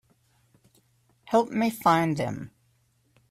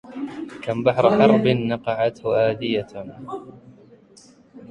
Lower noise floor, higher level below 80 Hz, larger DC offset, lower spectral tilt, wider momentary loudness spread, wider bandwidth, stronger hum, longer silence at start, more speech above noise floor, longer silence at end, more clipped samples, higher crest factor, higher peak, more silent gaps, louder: first, -67 dBFS vs -51 dBFS; second, -66 dBFS vs -56 dBFS; neither; second, -6 dB/octave vs -7.5 dB/octave; second, 14 LU vs 19 LU; first, 16 kHz vs 9.4 kHz; neither; first, 1.25 s vs 0.05 s; first, 43 dB vs 31 dB; first, 0.85 s vs 0.05 s; neither; about the same, 20 dB vs 20 dB; second, -8 dBFS vs -2 dBFS; neither; second, -25 LUFS vs -20 LUFS